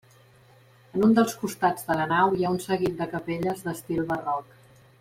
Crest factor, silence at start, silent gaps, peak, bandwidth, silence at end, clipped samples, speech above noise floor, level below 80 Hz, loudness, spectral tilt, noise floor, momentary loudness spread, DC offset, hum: 18 dB; 0.95 s; none; -8 dBFS; 16.5 kHz; 0.6 s; under 0.1%; 31 dB; -60 dBFS; -26 LUFS; -6 dB/octave; -56 dBFS; 10 LU; under 0.1%; none